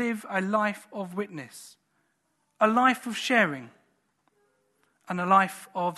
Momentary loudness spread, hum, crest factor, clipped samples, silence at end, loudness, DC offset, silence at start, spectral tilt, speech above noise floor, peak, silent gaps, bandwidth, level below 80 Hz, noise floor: 16 LU; none; 22 dB; under 0.1%; 0 s; -26 LUFS; under 0.1%; 0 s; -5 dB/octave; 48 dB; -6 dBFS; none; 13 kHz; -80 dBFS; -74 dBFS